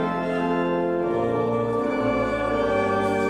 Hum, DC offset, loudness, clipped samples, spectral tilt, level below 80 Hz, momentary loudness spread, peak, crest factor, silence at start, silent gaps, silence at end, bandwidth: none; under 0.1%; -23 LUFS; under 0.1%; -7 dB/octave; -46 dBFS; 2 LU; -12 dBFS; 12 dB; 0 s; none; 0 s; 11.5 kHz